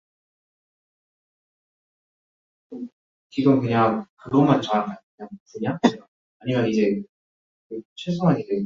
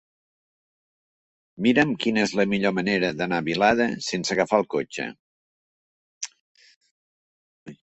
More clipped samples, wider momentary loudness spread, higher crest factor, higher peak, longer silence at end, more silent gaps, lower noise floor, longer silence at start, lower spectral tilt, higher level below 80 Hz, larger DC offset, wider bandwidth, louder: neither; first, 21 LU vs 14 LU; about the same, 24 dB vs 22 dB; first, 0 dBFS vs -4 dBFS; about the same, 0 s vs 0.1 s; second, 2.93-3.30 s, 4.09-4.17 s, 5.03-5.18 s, 5.40-5.46 s, 6.08-6.40 s, 7.09-7.70 s, 7.85-7.96 s vs 5.19-6.21 s, 6.40-6.55 s, 6.76-6.81 s, 6.91-7.66 s; about the same, under -90 dBFS vs under -90 dBFS; first, 2.7 s vs 1.6 s; first, -7.5 dB/octave vs -4.5 dB/octave; about the same, -62 dBFS vs -60 dBFS; neither; second, 7.4 kHz vs 8.4 kHz; about the same, -22 LUFS vs -23 LUFS